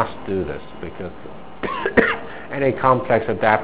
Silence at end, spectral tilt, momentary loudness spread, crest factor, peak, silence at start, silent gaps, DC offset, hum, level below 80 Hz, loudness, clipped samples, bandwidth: 0 s; -10 dB/octave; 16 LU; 22 dB; 0 dBFS; 0 s; none; 2%; none; -44 dBFS; -20 LUFS; under 0.1%; 4 kHz